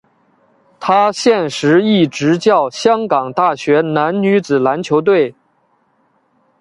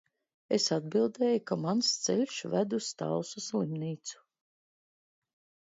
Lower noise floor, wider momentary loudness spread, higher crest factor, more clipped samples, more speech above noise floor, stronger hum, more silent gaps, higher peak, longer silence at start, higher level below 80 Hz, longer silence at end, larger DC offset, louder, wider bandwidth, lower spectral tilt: second, -59 dBFS vs under -90 dBFS; second, 4 LU vs 7 LU; about the same, 14 dB vs 18 dB; neither; second, 46 dB vs over 59 dB; neither; neither; first, 0 dBFS vs -14 dBFS; first, 0.8 s vs 0.5 s; first, -60 dBFS vs -78 dBFS; second, 1.3 s vs 1.55 s; neither; first, -14 LUFS vs -31 LUFS; first, 11.5 kHz vs 7.8 kHz; about the same, -5.5 dB/octave vs -4.5 dB/octave